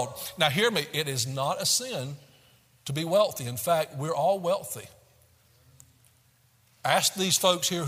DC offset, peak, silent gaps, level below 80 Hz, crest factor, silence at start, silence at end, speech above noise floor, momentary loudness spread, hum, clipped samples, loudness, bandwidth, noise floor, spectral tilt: under 0.1%; -8 dBFS; none; -68 dBFS; 22 dB; 0 s; 0 s; 36 dB; 12 LU; none; under 0.1%; -26 LUFS; 16 kHz; -64 dBFS; -3 dB/octave